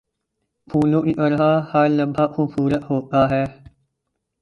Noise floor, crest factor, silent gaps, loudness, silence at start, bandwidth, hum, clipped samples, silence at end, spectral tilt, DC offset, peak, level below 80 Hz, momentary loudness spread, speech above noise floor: -77 dBFS; 16 dB; none; -19 LUFS; 0.7 s; 6.8 kHz; none; under 0.1%; 0.9 s; -9 dB/octave; under 0.1%; -4 dBFS; -50 dBFS; 5 LU; 59 dB